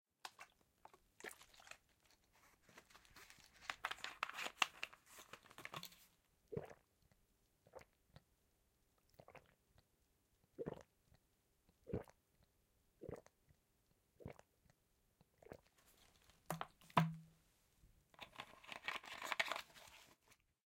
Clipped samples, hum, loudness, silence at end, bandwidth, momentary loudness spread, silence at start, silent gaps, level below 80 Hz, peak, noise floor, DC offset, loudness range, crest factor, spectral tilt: under 0.1%; none; -48 LUFS; 0.35 s; 16.5 kHz; 25 LU; 0.25 s; none; -76 dBFS; -16 dBFS; -81 dBFS; under 0.1%; 16 LU; 36 dB; -4 dB/octave